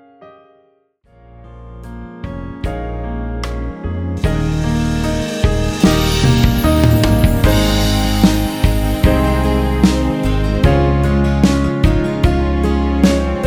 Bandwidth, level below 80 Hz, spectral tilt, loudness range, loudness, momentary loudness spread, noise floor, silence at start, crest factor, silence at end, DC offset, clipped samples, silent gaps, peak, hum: 19.5 kHz; -20 dBFS; -6 dB/octave; 13 LU; -15 LUFS; 11 LU; -55 dBFS; 0.2 s; 14 dB; 0 s; under 0.1%; under 0.1%; none; 0 dBFS; none